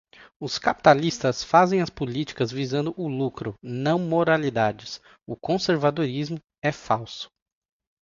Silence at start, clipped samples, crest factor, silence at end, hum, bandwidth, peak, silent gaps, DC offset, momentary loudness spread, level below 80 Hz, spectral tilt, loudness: 0.2 s; under 0.1%; 24 dB; 0.75 s; none; 7.6 kHz; 0 dBFS; 0.36-0.40 s, 6.58-6.62 s; under 0.1%; 17 LU; -58 dBFS; -5.5 dB/octave; -24 LUFS